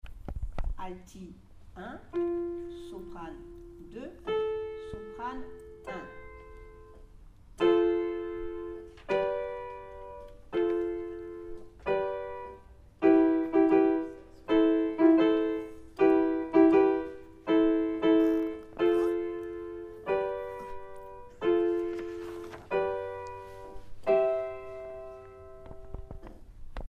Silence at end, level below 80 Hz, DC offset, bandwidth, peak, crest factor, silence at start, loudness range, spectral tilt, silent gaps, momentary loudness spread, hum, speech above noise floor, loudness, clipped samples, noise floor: 0 s; -48 dBFS; under 0.1%; 5 kHz; -10 dBFS; 20 dB; 0.05 s; 13 LU; -7.5 dB/octave; none; 22 LU; none; 14 dB; -29 LUFS; under 0.1%; -52 dBFS